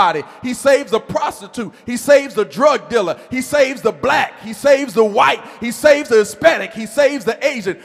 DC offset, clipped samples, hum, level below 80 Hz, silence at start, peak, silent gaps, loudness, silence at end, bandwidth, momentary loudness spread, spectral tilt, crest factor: under 0.1%; under 0.1%; none; -56 dBFS; 0 s; 0 dBFS; none; -16 LUFS; 0.1 s; 15.5 kHz; 10 LU; -3.5 dB/octave; 16 dB